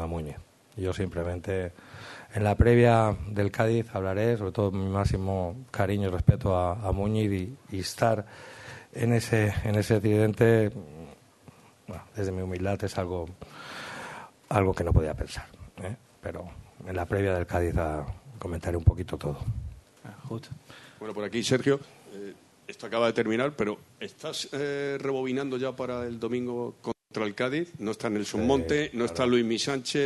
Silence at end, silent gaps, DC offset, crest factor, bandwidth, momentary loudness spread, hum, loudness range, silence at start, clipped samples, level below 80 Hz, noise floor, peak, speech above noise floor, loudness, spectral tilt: 0 s; none; under 0.1%; 22 dB; 12.5 kHz; 19 LU; none; 6 LU; 0 s; under 0.1%; -44 dBFS; -54 dBFS; -6 dBFS; 27 dB; -28 LUFS; -6.5 dB/octave